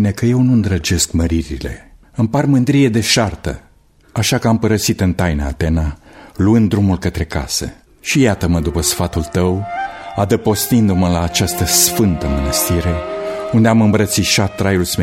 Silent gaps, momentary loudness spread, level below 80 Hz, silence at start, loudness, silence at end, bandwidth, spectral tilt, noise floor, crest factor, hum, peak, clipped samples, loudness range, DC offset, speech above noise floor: none; 11 LU; -30 dBFS; 0 s; -15 LUFS; 0 s; 16.5 kHz; -5 dB/octave; -49 dBFS; 16 dB; none; 0 dBFS; under 0.1%; 3 LU; under 0.1%; 35 dB